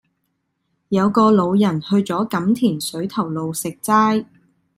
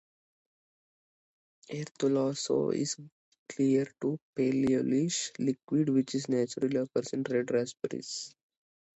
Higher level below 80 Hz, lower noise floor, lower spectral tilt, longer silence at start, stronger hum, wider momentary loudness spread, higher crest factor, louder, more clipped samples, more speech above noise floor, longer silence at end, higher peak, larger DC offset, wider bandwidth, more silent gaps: first, -60 dBFS vs -72 dBFS; second, -72 dBFS vs under -90 dBFS; about the same, -6 dB/octave vs -5 dB/octave; second, 0.9 s vs 1.7 s; neither; about the same, 9 LU vs 11 LU; about the same, 16 dB vs 16 dB; first, -18 LUFS vs -31 LUFS; neither; second, 54 dB vs over 60 dB; second, 0.55 s vs 0.7 s; first, -2 dBFS vs -16 dBFS; neither; first, 16 kHz vs 8.2 kHz; second, none vs 1.91-1.95 s, 3.12-3.32 s, 3.38-3.46 s, 4.22-4.33 s